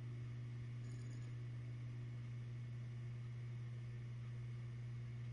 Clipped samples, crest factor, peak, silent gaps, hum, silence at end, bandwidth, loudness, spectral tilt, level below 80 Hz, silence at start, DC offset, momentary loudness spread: under 0.1%; 8 dB; -42 dBFS; none; none; 0 s; 7.4 kHz; -50 LUFS; -7.5 dB/octave; -68 dBFS; 0 s; under 0.1%; 0 LU